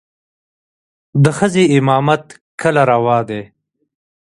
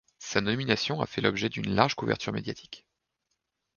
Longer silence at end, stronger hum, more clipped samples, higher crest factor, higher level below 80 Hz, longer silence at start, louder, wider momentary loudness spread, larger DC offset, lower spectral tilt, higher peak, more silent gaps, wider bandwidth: about the same, 0.9 s vs 1 s; neither; neither; second, 16 dB vs 26 dB; about the same, -54 dBFS vs -58 dBFS; first, 1.15 s vs 0.2 s; first, -14 LUFS vs -28 LUFS; second, 11 LU vs 14 LU; neither; first, -6.5 dB/octave vs -5 dB/octave; first, 0 dBFS vs -4 dBFS; first, 2.41-2.58 s vs none; first, 11.5 kHz vs 7.4 kHz